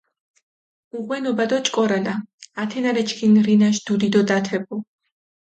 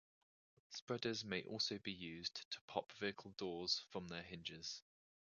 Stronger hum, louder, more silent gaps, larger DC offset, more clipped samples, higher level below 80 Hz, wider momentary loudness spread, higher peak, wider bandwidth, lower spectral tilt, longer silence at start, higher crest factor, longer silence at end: neither; first, -20 LUFS vs -46 LUFS; second, 2.34-2.38 s vs 0.82-0.87 s, 2.45-2.51 s, 2.61-2.68 s; neither; neither; first, -66 dBFS vs -76 dBFS; first, 15 LU vs 9 LU; first, -6 dBFS vs -24 dBFS; first, 8.6 kHz vs 7.2 kHz; first, -5 dB/octave vs -2 dB/octave; first, 0.95 s vs 0.7 s; second, 16 dB vs 24 dB; first, 0.75 s vs 0.45 s